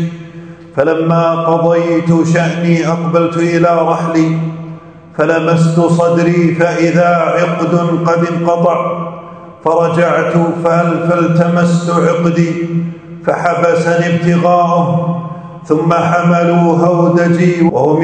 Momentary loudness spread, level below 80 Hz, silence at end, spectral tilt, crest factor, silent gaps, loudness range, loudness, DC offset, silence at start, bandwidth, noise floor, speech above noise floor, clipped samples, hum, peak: 10 LU; -54 dBFS; 0 s; -7.5 dB/octave; 12 dB; none; 2 LU; -12 LUFS; under 0.1%; 0 s; 9 kHz; -31 dBFS; 20 dB; under 0.1%; none; 0 dBFS